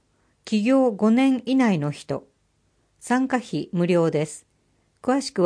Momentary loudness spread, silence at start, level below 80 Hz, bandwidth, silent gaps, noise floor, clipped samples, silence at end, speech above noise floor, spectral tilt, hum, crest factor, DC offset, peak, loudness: 13 LU; 0.45 s; -68 dBFS; 10.5 kHz; none; -67 dBFS; under 0.1%; 0 s; 45 dB; -6.5 dB/octave; none; 16 dB; under 0.1%; -6 dBFS; -22 LUFS